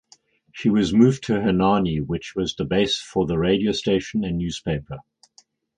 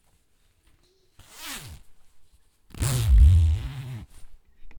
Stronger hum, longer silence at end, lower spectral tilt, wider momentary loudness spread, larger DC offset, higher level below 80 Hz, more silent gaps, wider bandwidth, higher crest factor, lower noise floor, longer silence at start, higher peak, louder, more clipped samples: neither; first, 0.75 s vs 0 s; about the same, -6 dB/octave vs -5 dB/octave; second, 10 LU vs 22 LU; neither; second, -44 dBFS vs -26 dBFS; neither; second, 9.6 kHz vs over 20 kHz; about the same, 20 dB vs 18 dB; second, -58 dBFS vs -64 dBFS; second, 0.55 s vs 1.4 s; first, -2 dBFS vs -8 dBFS; about the same, -22 LUFS vs -23 LUFS; neither